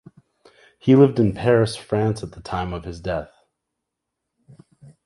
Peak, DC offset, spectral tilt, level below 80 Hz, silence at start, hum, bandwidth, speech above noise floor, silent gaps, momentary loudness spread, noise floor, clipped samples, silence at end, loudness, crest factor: -2 dBFS; under 0.1%; -7.5 dB/octave; -46 dBFS; 0.85 s; none; 11.5 kHz; 62 dB; none; 15 LU; -81 dBFS; under 0.1%; 1.8 s; -20 LUFS; 20 dB